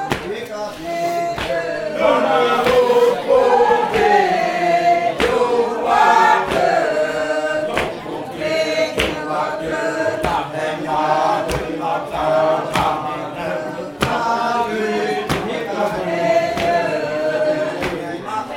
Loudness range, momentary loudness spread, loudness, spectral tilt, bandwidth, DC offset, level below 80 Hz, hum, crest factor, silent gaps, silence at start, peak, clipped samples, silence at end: 5 LU; 10 LU; -18 LUFS; -4.5 dB/octave; 17 kHz; under 0.1%; -44 dBFS; none; 16 dB; none; 0 s; 0 dBFS; under 0.1%; 0 s